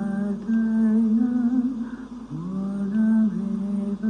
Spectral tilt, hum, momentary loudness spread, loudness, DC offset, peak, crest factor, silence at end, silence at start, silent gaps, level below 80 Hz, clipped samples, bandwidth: -9.5 dB/octave; none; 12 LU; -23 LUFS; under 0.1%; -12 dBFS; 10 dB; 0 s; 0 s; none; -54 dBFS; under 0.1%; 3.9 kHz